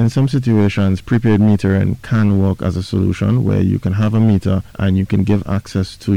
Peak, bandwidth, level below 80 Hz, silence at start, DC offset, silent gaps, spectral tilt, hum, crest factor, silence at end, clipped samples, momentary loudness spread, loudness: -6 dBFS; 10.5 kHz; -38 dBFS; 0 s; under 0.1%; none; -8.5 dB/octave; none; 8 dB; 0 s; under 0.1%; 6 LU; -16 LUFS